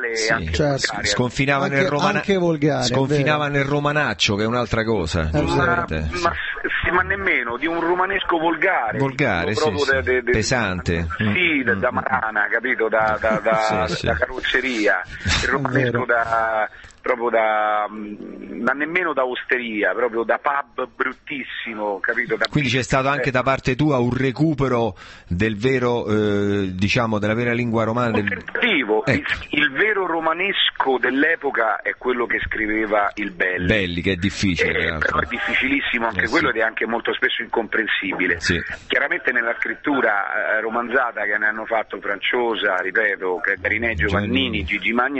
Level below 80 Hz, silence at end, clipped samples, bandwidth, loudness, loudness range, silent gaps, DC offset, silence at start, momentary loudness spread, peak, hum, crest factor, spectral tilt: -40 dBFS; 0 s; under 0.1%; 8.6 kHz; -20 LUFS; 2 LU; none; under 0.1%; 0 s; 5 LU; -2 dBFS; none; 18 dB; -5 dB/octave